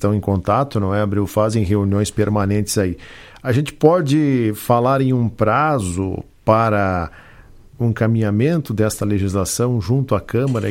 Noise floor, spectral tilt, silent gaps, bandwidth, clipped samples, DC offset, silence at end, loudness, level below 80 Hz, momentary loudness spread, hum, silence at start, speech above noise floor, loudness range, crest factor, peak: -43 dBFS; -6.5 dB/octave; none; 16.5 kHz; under 0.1%; under 0.1%; 0 s; -18 LUFS; -42 dBFS; 7 LU; none; 0 s; 26 dB; 2 LU; 18 dB; 0 dBFS